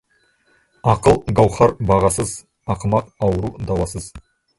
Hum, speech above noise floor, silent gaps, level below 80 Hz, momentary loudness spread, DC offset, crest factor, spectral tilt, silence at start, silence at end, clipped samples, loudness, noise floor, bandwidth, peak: none; 43 dB; none; -36 dBFS; 12 LU; under 0.1%; 18 dB; -6.5 dB/octave; 0.85 s; 0.4 s; under 0.1%; -18 LUFS; -61 dBFS; 12 kHz; 0 dBFS